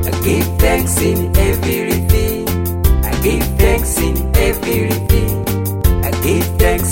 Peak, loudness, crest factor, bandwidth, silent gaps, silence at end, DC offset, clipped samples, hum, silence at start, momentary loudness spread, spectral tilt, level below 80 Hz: 0 dBFS; -15 LUFS; 14 dB; 16.5 kHz; none; 0 s; under 0.1%; under 0.1%; none; 0 s; 3 LU; -5.5 dB/octave; -18 dBFS